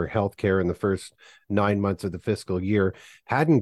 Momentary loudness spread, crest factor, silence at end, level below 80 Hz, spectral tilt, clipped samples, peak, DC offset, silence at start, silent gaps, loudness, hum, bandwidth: 6 LU; 16 dB; 0 s; -46 dBFS; -7.5 dB/octave; under 0.1%; -8 dBFS; under 0.1%; 0 s; none; -25 LUFS; none; 12.5 kHz